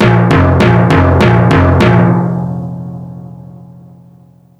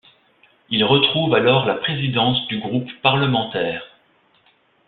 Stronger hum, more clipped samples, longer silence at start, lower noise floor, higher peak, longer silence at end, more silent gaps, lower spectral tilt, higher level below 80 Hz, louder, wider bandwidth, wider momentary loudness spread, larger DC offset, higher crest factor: neither; first, 0.1% vs under 0.1%; second, 0 s vs 0.7 s; second, -42 dBFS vs -59 dBFS; about the same, 0 dBFS vs 0 dBFS; about the same, 1.05 s vs 1 s; neither; second, -8 dB/octave vs -9.5 dB/octave; first, -28 dBFS vs -56 dBFS; first, -9 LUFS vs -18 LUFS; first, 9.8 kHz vs 4.5 kHz; first, 18 LU vs 9 LU; neither; second, 10 dB vs 20 dB